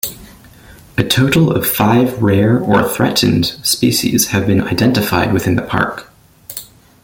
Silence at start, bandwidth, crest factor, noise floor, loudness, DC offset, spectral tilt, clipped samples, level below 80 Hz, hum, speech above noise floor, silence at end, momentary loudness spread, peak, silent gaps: 0.05 s; 17 kHz; 14 dB; -40 dBFS; -14 LUFS; under 0.1%; -4.5 dB/octave; under 0.1%; -42 dBFS; none; 27 dB; 0.4 s; 12 LU; 0 dBFS; none